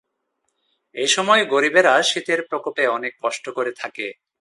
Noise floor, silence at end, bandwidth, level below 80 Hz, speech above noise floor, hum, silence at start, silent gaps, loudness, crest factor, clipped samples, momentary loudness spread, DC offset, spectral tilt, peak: -74 dBFS; 0.3 s; 11.5 kHz; -76 dBFS; 54 dB; none; 0.95 s; none; -19 LUFS; 20 dB; under 0.1%; 14 LU; under 0.1%; -1.5 dB/octave; -2 dBFS